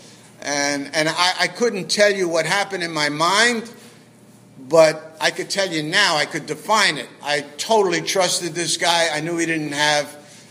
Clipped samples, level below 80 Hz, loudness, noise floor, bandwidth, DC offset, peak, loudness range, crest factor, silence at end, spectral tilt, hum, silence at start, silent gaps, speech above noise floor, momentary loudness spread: under 0.1%; -74 dBFS; -19 LUFS; -48 dBFS; 15.5 kHz; under 0.1%; 0 dBFS; 1 LU; 20 dB; 0.1 s; -2.5 dB/octave; none; 0 s; none; 28 dB; 8 LU